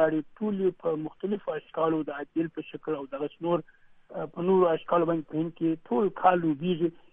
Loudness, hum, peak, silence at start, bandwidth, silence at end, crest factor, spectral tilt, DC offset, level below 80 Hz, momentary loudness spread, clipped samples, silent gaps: -29 LUFS; none; -8 dBFS; 0 s; 3.8 kHz; 0.15 s; 20 dB; -10 dB/octave; under 0.1%; -66 dBFS; 11 LU; under 0.1%; none